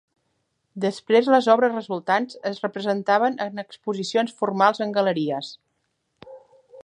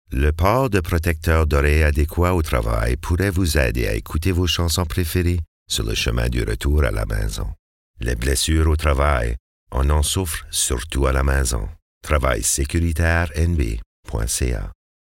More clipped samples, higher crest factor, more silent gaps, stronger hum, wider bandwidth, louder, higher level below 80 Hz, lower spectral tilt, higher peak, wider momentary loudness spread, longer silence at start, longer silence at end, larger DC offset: neither; about the same, 20 dB vs 16 dB; second, none vs 5.48-5.66 s, 7.59-7.94 s, 9.40-9.67 s, 11.82-12.01 s, 13.86-14.03 s; neither; second, 10.5 kHz vs 17 kHz; about the same, -22 LUFS vs -21 LUFS; second, -76 dBFS vs -24 dBFS; about the same, -5.5 dB/octave vs -4.5 dB/octave; about the same, -2 dBFS vs -4 dBFS; first, 13 LU vs 9 LU; first, 0.75 s vs 0.1 s; second, 0 s vs 0.3 s; neither